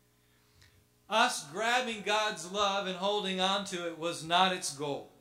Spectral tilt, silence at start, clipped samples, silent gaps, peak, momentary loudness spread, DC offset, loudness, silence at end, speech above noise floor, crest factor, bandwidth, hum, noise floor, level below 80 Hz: -2.5 dB/octave; 1.1 s; under 0.1%; none; -8 dBFS; 9 LU; under 0.1%; -31 LUFS; 0.1 s; 36 dB; 24 dB; 16 kHz; 60 Hz at -60 dBFS; -68 dBFS; -72 dBFS